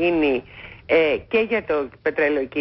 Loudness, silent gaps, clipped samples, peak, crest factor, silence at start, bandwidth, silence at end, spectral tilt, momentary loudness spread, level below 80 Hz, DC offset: -21 LUFS; none; under 0.1%; -8 dBFS; 14 dB; 0 s; 5.8 kHz; 0 s; -10 dB/octave; 8 LU; -50 dBFS; under 0.1%